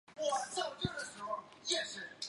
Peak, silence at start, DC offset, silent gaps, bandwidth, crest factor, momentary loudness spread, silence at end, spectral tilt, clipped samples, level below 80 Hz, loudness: -18 dBFS; 0.1 s; under 0.1%; none; 11.5 kHz; 22 dB; 7 LU; 0 s; -2.5 dB/octave; under 0.1%; -66 dBFS; -38 LUFS